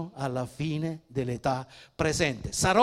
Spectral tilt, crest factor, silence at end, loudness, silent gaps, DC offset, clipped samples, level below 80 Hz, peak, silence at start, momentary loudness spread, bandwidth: -4.5 dB/octave; 22 dB; 0 s; -30 LUFS; none; under 0.1%; under 0.1%; -50 dBFS; -8 dBFS; 0 s; 7 LU; 15.5 kHz